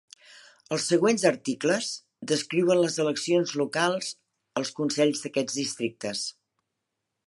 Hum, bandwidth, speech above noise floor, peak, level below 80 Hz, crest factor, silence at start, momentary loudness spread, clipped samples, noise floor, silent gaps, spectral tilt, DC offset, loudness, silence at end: none; 11.5 kHz; 57 dB; -8 dBFS; -76 dBFS; 20 dB; 0.3 s; 10 LU; under 0.1%; -83 dBFS; none; -4 dB/octave; under 0.1%; -26 LUFS; 0.95 s